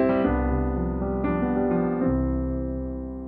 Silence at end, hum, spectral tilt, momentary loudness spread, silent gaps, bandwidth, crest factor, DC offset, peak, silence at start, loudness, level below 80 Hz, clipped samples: 0 s; none; -12 dB/octave; 6 LU; none; 4.3 kHz; 14 dB; under 0.1%; -10 dBFS; 0 s; -25 LUFS; -32 dBFS; under 0.1%